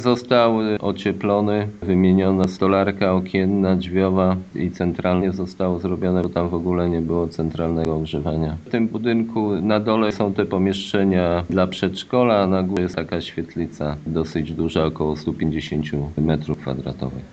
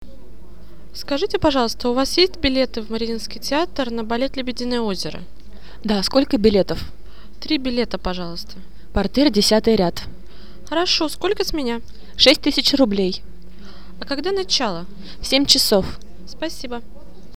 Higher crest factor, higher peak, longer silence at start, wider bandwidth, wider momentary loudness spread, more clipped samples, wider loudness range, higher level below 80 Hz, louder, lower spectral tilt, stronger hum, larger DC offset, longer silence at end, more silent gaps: about the same, 18 dB vs 22 dB; about the same, -2 dBFS vs 0 dBFS; about the same, 0 s vs 0.05 s; second, 8 kHz vs 18 kHz; second, 8 LU vs 18 LU; neither; about the same, 4 LU vs 3 LU; about the same, -42 dBFS vs -38 dBFS; about the same, -21 LUFS vs -19 LUFS; first, -8 dB/octave vs -4 dB/octave; neither; second, under 0.1% vs 4%; about the same, 0.05 s vs 0 s; neither